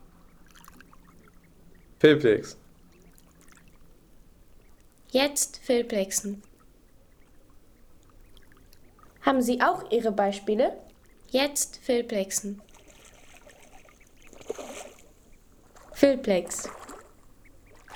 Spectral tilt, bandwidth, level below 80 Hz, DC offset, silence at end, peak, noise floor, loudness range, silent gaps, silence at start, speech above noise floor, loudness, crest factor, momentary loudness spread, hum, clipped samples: -3.5 dB/octave; over 20 kHz; -58 dBFS; under 0.1%; 0 s; -6 dBFS; -56 dBFS; 9 LU; none; 2 s; 31 dB; -26 LUFS; 24 dB; 22 LU; none; under 0.1%